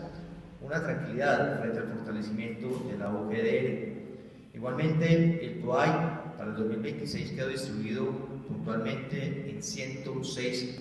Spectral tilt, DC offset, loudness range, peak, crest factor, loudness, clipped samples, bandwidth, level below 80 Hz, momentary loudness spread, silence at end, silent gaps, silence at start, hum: -6 dB/octave; under 0.1%; 5 LU; -12 dBFS; 20 dB; -32 LUFS; under 0.1%; 12 kHz; -62 dBFS; 12 LU; 0 s; none; 0 s; none